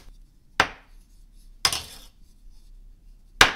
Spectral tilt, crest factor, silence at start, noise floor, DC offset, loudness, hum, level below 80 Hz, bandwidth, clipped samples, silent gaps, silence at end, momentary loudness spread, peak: -1 dB/octave; 28 dB; 0.05 s; -50 dBFS; under 0.1%; -24 LUFS; none; -46 dBFS; 16 kHz; under 0.1%; none; 0 s; 18 LU; 0 dBFS